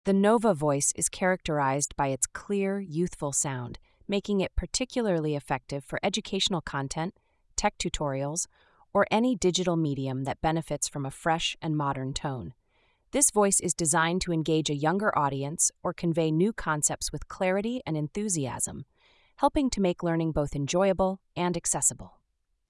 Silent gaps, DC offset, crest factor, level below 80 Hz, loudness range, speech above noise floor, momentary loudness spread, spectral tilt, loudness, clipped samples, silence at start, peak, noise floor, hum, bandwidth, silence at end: none; under 0.1%; 22 dB; -48 dBFS; 4 LU; 47 dB; 9 LU; -4 dB/octave; -28 LUFS; under 0.1%; 0.05 s; -6 dBFS; -75 dBFS; none; 12 kHz; 0.6 s